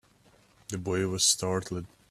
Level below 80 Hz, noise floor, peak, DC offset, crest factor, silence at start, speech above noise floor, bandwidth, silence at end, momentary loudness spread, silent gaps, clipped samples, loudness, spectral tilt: -62 dBFS; -62 dBFS; -10 dBFS; under 0.1%; 20 dB; 0.7 s; 33 dB; 15 kHz; 0.25 s; 16 LU; none; under 0.1%; -27 LUFS; -3 dB/octave